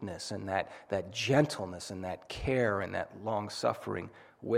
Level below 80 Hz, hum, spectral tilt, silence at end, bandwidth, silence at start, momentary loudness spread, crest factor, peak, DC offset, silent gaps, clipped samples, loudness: -56 dBFS; none; -5 dB/octave; 0 s; 15.5 kHz; 0 s; 12 LU; 20 dB; -14 dBFS; under 0.1%; none; under 0.1%; -34 LUFS